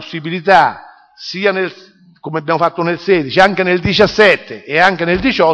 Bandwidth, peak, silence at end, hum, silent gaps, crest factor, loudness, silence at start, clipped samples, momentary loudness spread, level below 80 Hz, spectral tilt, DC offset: 10 kHz; 0 dBFS; 0 s; none; none; 14 dB; -13 LUFS; 0 s; under 0.1%; 12 LU; -42 dBFS; -5.5 dB/octave; under 0.1%